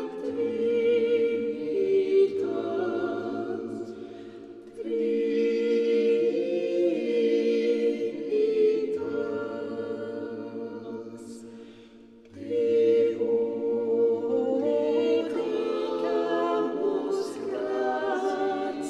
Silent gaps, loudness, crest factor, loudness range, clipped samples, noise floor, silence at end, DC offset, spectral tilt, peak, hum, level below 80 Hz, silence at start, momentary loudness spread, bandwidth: none; -27 LUFS; 14 dB; 5 LU; under 0.1%; -51 dBFS; 0 s; under 0.1%; -6 dB/octave; -14 dBFS; none; -72 dBFS; 0 s; 14 LU; 9.2 kHz